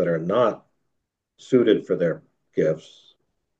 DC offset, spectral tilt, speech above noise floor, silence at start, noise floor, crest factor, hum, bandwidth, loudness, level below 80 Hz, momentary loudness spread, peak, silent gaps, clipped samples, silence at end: under 0.1%; -7.5 dB/octave; 57 dB; 0 s; -78 dBFS; 18 dB; none; 8 kHz; -22 LUFS; -68 dBFS; 14 LU; -6 dBFS; none; under 0.1%; 0.8 s